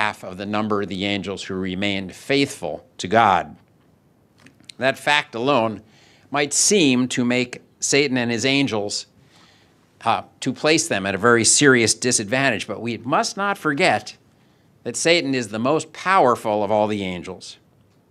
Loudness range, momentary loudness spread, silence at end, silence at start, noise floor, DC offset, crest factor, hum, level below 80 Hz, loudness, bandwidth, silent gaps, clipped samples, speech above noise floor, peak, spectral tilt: 5 LU; 13 LU; 0.55 s; 0 s; -57 dBFS; under 0.1%; 20 dB; none; -62 dBFS; -20 LUFS; 14.5 kHz; none; under 0.1%; 37 dB; 0 dBFS; -3 dB/octave